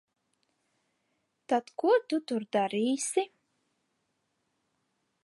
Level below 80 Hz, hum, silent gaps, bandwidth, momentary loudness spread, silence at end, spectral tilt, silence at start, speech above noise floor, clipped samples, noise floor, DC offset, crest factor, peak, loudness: -88 dBFS; none; none; 11.5 kHz; 5 LU; 2 s; -3.5 dB/octave; 1.5 s; 50 dB; under 0.1%; -79 dBFS; under 0.1%; 20 dB; -14 dBFS; -29 LUFS